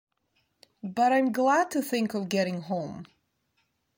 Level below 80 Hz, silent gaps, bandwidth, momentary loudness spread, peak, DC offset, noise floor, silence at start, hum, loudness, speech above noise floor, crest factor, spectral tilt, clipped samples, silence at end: -72 dBFS; none; 16.5 kHz; 15 LU; -14 dBFS; under 0.1%; -74 dBFS; 0.85 s; none; -27 LUFS; 48 dB; 16 dB; -5 dB/octave; under 0.1%; 0.95 s